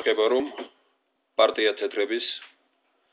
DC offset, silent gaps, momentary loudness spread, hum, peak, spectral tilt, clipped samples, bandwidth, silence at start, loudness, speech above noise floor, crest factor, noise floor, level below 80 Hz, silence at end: under 0.1%; none; 16 LU; none; -8 dBFS; -6 dB/octave; under 0.1%; 4 kHz; 0 s; -25 LUFS; 47 dB; 18 dB; -72 dBFS; -76 dBFS; 0.65 s